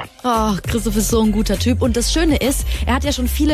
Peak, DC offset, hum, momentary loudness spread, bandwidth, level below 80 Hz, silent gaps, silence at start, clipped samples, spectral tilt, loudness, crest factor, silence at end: -4 dBFS; under 0.1%; none; 4 LU; 16 kHz; -24 dBFS; none; 0 s; under 0.1%; -4.5 dB/octave; -18 LUFS; 12 dB; 0 s